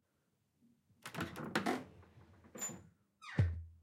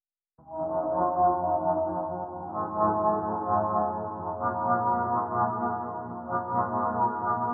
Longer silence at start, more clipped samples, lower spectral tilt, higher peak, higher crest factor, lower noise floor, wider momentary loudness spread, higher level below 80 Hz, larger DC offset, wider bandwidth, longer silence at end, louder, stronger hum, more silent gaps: first, 1.05 s vs 0.45 s; neither; first, -5 dB/octave vs -3 dB/octave; second, -22 dBFS vs -12 dBFS; first, 22 dB vs 16 dB; first, -81 dBFS vs -57 dBFS; first, 19 LU vs 9 LU; about the same, -58 dBFS vs -60 dBFS; neither; first, 16 kHz vs 2.1 kHz; about the same, 0.05 s vs 0 s; second, -41 LUFS vs -28 LUFS; neither; neither